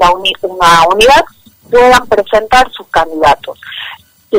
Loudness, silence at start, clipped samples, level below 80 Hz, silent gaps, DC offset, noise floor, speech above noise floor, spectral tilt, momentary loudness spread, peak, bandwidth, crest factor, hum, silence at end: -8 LUFS; 0 s; under 0.1%; -32 dBFS; none; under 0.1%; -30 dBFS; 22 dB; -2.5 dB/octave; 17 LU; 0 dBFS; 16.5 kHz; 10 dB; none; 0 s